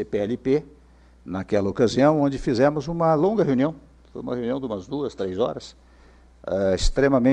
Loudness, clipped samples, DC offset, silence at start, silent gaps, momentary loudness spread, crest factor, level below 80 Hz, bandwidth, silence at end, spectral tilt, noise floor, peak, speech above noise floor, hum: -23 LUFS; under 0.1%; under 0.1%; 0 s; none; 14 LU; 16 dB; -36 dBFS; 10 kHz; 0 s; -6.5 dB/octave; -51 dBFS; -6 dBFS; 29 dB; none